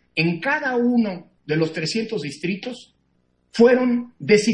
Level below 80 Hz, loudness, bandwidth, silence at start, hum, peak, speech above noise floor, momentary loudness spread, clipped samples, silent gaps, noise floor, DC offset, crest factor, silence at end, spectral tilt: -64 dBFS; -21 LUFS; 11 kHz; 0.15 s; none; -2 dBFS; 46 dB; 14 LU; under 0.1%; none; -66 dBFS; under 0.1%; 18 dB; 0 s; -5.5 dB/octave